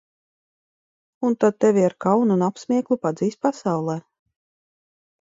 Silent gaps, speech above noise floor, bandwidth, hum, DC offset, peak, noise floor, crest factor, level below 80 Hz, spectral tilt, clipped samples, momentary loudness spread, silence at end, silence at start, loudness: none; over 70 dB; 7.8 kHz; none; under 0.1%; -4 dBFS; under -90 dBFS; 18 dB; -68 dBFS; -7.5 dB/octave; under 0.1%; 7 LU; 1.2 s; 1.2 s; -21 LUFS